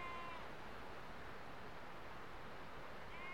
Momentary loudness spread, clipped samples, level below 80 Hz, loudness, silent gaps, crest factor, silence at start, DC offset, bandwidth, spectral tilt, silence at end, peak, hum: 3 LU; under 0.1%; -66 dBFS; -53 LUFS; none; 14 dB; 0 s; 0.3%; 16.5 kHz; -5 dB/octave; 0 s; -38 dBFS; none